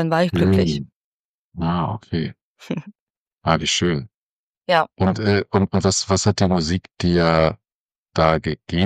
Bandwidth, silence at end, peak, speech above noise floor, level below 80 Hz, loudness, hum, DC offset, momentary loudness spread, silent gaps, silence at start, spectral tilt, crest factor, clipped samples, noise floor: 10.5 kHz; 0 s; -2 dBFS; over 71 dB; -42 dBFS; -20 LUFS; none; under 0.1%; 13 LU; 0.94-1.51 s, 2.42-2.56 s, 3.00-3.26 s, 3.32-3.36 s, 4.14-4.61 s, 7.74-7.89 s, 7.98-8.06 s; 0 s; -5 dB/octave; 18 dB; under 0.1%; under -90 dBFS